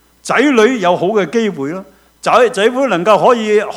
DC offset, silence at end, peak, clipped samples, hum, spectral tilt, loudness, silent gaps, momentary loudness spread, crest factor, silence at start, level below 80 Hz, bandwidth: under 0.1%; 0 s; 0 dBFS; 0.1%; none; -4.5 dB/octave; -12 LUFS; none; 11 LU; 12 dB; 0.25 s; -56 dBFS; 13.5 kHz